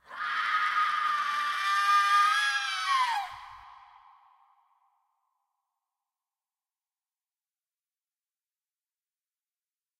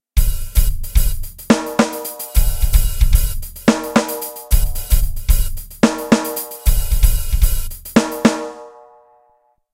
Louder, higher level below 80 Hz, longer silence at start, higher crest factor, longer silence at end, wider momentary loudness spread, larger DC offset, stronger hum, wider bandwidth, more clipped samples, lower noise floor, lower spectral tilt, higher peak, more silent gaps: second, -26 LUFS vs -19 LUFS; second, -78 dBFS vs -18 dBFS; about the same, 0.1 s vs 0.15 s; about the same, 18 dB vs 16 dB; first, 6.25 s vs 1.05 s; about the same, 9 LU vs 8 LU; neither; neither; about the same, 15.5 kHz vs 16.5 kHz; neither; first, under -90 dBFS vs -59 dBFS; second, 3 dB/octave vs -5 dB/octave; second, -14 dBFS vs 0 dBFS; neither